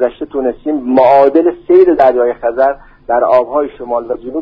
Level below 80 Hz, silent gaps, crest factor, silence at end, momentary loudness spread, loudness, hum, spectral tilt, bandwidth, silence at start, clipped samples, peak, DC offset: -44 dBFS; none; 12 dB; 0 s; 11 LU; -12 LUFS; none; -8 dB/octave; 5.2 kHz; 0 s; under 0.1%; 0 dBFS; under 0.1%